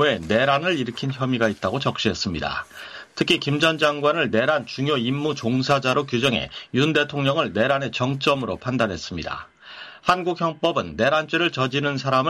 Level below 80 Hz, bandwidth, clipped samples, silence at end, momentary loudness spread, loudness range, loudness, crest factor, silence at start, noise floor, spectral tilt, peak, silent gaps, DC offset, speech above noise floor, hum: -52 dBFS; 14 kHz; under 0.1%; 0 s; 9 LU; 3 LU; -22 LUFS; 18 dB; 0 s; -42 dBFS; -5 dB/octave; -6 dBFS; none; under 0.1%; 20 dB; none